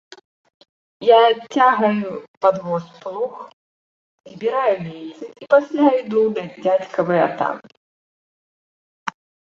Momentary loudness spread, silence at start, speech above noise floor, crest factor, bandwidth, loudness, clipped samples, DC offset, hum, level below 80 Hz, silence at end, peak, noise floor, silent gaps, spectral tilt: 17 LU; 1 s; over 72 dB; 18 dB; 7.4 kHz; -18 LUFS; under 0.1%; under 0.1%; none; -70 dBFS; 0.45 s; -2 dBFS; under -90 dBFS; 2.28-2.41 s, 3.53-4.18 s, 7.77-9.06 s; -6.5 dB/octave